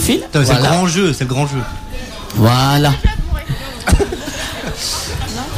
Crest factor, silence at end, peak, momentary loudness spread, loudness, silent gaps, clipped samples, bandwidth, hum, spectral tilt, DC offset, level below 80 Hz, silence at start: 14 dB; 0 s; -2 dBFS; 11 LU; -16 LUFS; none; under 0.1%; 16 kHz; none; -5 dB/octave; under 0.1%; -24 dBFS; 0 s